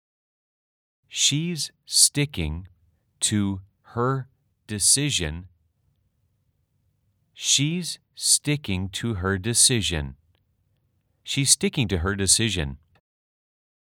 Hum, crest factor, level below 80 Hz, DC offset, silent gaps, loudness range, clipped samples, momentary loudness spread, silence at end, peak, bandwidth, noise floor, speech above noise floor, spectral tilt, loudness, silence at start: none; 24 dB; -48 dBFS; under 0.1%; none; 4 LU; under 0.1%; 15 LU; 1.05 s; -2 dBFS; 20 kHz; -70 dBFS; 47 dB; -2.5 dB/octave; -22 LUFS; 1.1 s